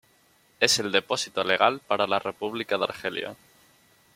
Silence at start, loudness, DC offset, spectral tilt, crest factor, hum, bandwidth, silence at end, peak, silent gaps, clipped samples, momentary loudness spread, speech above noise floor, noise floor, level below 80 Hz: 0.6 s; -25 LUFS; under 0.1%; -2 dB/octave; 26 dB; none; 16.5 kHz; 0.8 s; -2 dBFS; none; under 0.1%; 10 LU; 36 dB; -62 dBFS; -70 dBFS